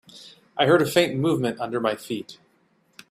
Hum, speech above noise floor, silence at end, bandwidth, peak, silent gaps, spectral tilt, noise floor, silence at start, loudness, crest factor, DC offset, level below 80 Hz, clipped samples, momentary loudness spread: none; 42 dB; 0.8 s; 15.5 kHz; -4 dBFS; none; -5.5 dB/octave; -64 dBFS; 0.15 s; -23 LUFS; 20 dB; under 0.1%; -64 dBFS; under 0.1%; 14 LU